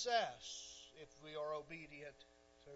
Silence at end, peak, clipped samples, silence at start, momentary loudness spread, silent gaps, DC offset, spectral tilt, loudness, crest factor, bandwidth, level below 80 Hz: 0 s; -22 dBFS; under 0.1%; 0 s; 23 LU; none; under 0.1%; -0.5 dB/octave; -47 LUFS; 24 dB; 7.6 kHz; -76 dBFS